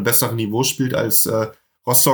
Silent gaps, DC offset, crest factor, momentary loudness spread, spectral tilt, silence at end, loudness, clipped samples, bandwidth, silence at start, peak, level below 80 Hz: none; under 0.1%; 18 dB; 10 LU; -3.5 dB/octave; 0 s; -17 LUFS; under 0.1%; over 20 kHz; 0 s; 0 dBFS; -60 dBFS